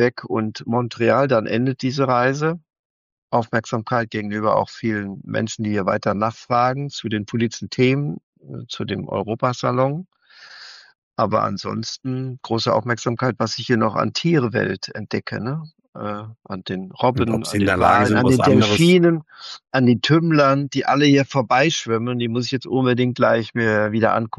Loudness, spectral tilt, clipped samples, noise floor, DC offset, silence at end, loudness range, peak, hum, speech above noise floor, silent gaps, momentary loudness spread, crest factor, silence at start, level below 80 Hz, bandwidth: -20 LUFS; -6 dB/octave; under 0.1%; -43 dBFS; under 0.1%; 0.1 s; 8 LU; -4 dBFS; none; 24 dB; 2.79-3.28 s, 8.23-8.33 s, 10.98-11.11 s, 15.88-15.93 s; 14 LU; 16 dB; 0 s; -56 dBFS; 12.5 kHz